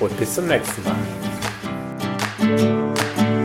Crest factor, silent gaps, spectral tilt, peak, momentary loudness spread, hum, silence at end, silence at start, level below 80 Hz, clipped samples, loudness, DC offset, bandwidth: 18 dB; none; -5 dB/octave; -2 dBFS; 8 LU; none; 0 s; 0 s; -50 dBFS; under 0.1%; -22 LUFS; under 0.1%; 16.5 kHz